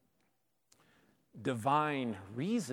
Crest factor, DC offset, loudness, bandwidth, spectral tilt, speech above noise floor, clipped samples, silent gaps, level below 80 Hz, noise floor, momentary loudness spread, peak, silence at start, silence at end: 20 dB; under 0.1%; -35 LUFS; 16 kHz; -6 dB/octave; 46 dB; under 0.1%; none; -82 dBFS; -80 dBFS; 9 LU; -18 dBFS; 1.35 s; 0 s